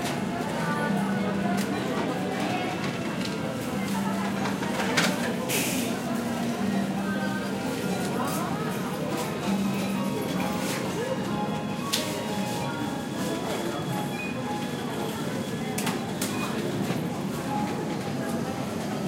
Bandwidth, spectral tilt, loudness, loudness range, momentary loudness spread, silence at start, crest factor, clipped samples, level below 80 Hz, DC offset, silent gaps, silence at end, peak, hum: 16 kHz; -5 dB/octave; -29 LUFS; 3 LU; 4 LU; 0 s; 22 dB; under 0.1%; -58 dBFS; under 0.1%; none; 0 s; -6 dBFS; none